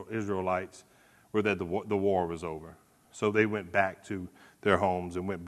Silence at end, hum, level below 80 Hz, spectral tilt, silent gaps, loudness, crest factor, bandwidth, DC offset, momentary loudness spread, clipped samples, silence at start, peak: 0 s; none; -62 dBFS; -6.5 dB/octave; none; -31 LUFS; 24 dB; 13 kHz; under 0.1%; 13 LU; under 0.1%; 0 s; -8 dBFS